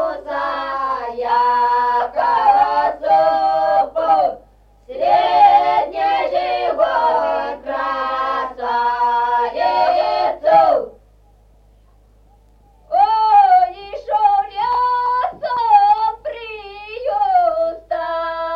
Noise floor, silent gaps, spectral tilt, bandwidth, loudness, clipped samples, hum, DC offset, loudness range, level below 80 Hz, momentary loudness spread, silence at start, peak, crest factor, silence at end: -50 dBFS; none; -4.5 dB/octave; 6.2 kHz; -16 LUFS; under 0.1%; none; under 0.1%; 3 LU; -50 dBFS; 10 LU; 0 s; -2 dBFS; 14 dB; 0 s